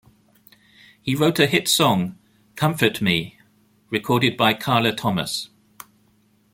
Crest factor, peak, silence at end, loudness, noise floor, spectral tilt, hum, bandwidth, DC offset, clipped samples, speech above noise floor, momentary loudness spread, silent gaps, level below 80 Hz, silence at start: 20 dB; -2 dBFS; 1.05 s; -20 LUFS; -60 dBFS; -4 dB/octave; none; 17 kHz; under 0.1%; under 0.1%; 40 dB; 12 LU; none; -58 dBFS; 1.05 s